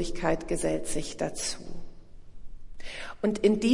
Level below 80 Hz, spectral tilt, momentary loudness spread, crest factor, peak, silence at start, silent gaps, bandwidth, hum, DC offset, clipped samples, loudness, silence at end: -42 dBFS; -4.5 dB/octave; 19 LU; 20 dB; -10 dBFS; 0 s; none; 11.5 kHz; none; under 0.1%; under 0.1%; -30 LUFS; 0 s